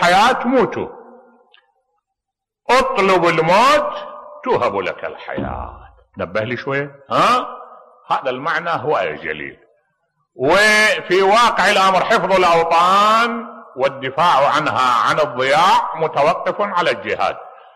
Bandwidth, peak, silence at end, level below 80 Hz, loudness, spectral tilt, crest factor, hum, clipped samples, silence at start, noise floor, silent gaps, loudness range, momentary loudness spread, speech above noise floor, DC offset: 13.5 kHz; -4 dBFS; 0.25 s; -48 dBFS; -15 LUFS; -4 dB/octave; 12 dB; none; under 0.1%; 0 s; -82 dBFS; none; 8 LU; 16 LU; 66 dB; under 0.1%